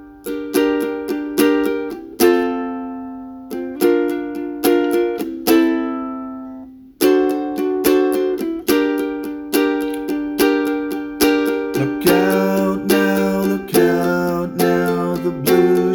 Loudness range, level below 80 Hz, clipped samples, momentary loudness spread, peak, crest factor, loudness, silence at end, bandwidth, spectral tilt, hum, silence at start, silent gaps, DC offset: 3 LU; -50 dBFS; under 0.1%; 12 LU; -2 dBFS; 16 dB; -18 LUFS; 0 s; over 20 kHz; -5 dB/octave; none; 0 s; none; under 0.1%